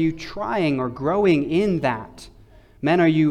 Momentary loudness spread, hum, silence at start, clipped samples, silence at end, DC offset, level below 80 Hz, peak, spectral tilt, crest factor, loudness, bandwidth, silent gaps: 11 LU; none; 0 s; under 0.1%; 0 s; under 0.1%; -50 dBFS; -8 dBFS; -7.5 dB/octave; 14 dB; -21 LUFS; 10 kHz; none